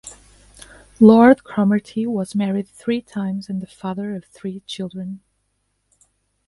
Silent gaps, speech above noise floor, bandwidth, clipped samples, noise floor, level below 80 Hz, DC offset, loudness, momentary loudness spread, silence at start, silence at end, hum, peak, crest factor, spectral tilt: none; 52 dB; 11.5 kHz; under 0.1%; -70 dBFS; -56 dBFS; under 0.1%; -19 LUFS; 20 LU; 0.05 s; 1.3 s; 50 Hz at -60 dBFS; 0 dBFS; 20 dB; -7 dB/octave